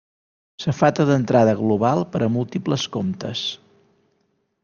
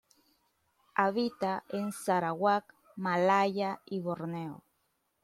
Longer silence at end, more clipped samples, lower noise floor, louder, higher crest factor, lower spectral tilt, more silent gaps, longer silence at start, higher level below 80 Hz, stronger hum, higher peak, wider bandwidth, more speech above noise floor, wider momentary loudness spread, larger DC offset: first, 1.05 s vs 0.65 s; neither; second, -68 dBFS vs -77 dBFS; first, -21 LUFS vs -31 LUFS; about the same, 20 dB vs 22 dB; about the same, -6.5 dB/octave vs -5.5 dB/octave; neither; second, 0.6 s vs 0.95 s; first, -58 dBFS vs -78 dBFS; neither; first, -2 dBFS vs -10 dBFS; second, 7.2 kHz vs 14.5 kHz; about the same, 49 dB vs 46 dB; about the same, 10 LU vs 12 LU; neither